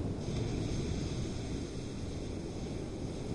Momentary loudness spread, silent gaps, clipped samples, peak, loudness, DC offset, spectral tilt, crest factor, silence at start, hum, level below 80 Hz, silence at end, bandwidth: 5 LU; none; under 0.1%; -22 dBFS; -39 LUFS; under 0.1%; -6 dB/octave; 14 dB; 0 s; none; -46 dBFS; 0 s; 11.5 kHz